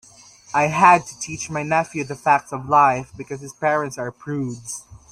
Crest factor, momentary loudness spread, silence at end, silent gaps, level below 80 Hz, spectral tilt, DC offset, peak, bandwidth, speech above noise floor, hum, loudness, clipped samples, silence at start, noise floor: 20 dB; 18 LU; 0.15 s; none; -56 dBFS; -5 dB/octave; under 0.1%; 0 dBFS; 13.5 kHz; 27 dB; none; -20 LUFS; under 0.1%; 0.5 s; -47 dBFS